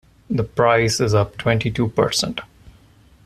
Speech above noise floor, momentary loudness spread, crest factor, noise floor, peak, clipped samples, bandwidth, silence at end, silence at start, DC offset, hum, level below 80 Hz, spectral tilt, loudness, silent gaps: 32 dB; 9 LU; 18 dB; -51 dBFS; -2 dBFS; under 0.1%; 14 kHz; 0.55 s; 0.3 s; under 0.1%; none; -44 dBFS; -5 dB/octave; -19 LUFS; none